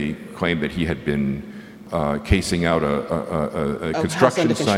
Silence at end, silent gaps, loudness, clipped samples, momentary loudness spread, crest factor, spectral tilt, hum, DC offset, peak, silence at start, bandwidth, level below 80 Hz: 0 s; none; -22 LUFS; under 0.1%; 9 LU; 22 dB; -5.5 dB/octave; none; under 0.1%; 0 dBFS; 0 s; 16 kHz; -36 dBFS